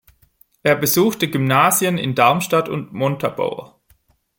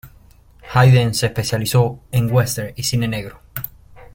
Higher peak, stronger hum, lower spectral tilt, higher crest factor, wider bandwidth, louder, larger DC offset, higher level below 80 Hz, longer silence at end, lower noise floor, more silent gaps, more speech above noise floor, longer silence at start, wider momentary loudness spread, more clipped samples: about the same, 0 dBFS vs -2 dBFS; neither; about the same, -4.5 dB/octave vs -5.5 dB/octave; about the same, 18 dB vs 18 dB; about the same, 17 kHz vs 17 kHz; about the same, -18 LUFS vs -18 LUFS; neither; second, -58 dBFS vs -44 dBFS; first, 0.7 s vs 0.15 s; first, -58 dBFS vs -47 dBFS; neither; first, 41 dB vs 30 dB; first, 0.65 s vs 0.05 s; second, 10 LU vs 16 LU; neither